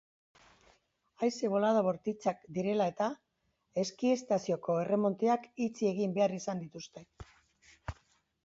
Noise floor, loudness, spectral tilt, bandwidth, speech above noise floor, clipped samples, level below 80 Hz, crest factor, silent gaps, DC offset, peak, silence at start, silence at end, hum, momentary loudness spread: -79 dBFS; -33 LUFS; -6 dB/octave; 8 kHz; 47 dB; under 0.1%; -62 dBFS; 18 dB; none; under 0.1%; -16 dBFS; 1.2 s; 0.5 s; none; 17 LU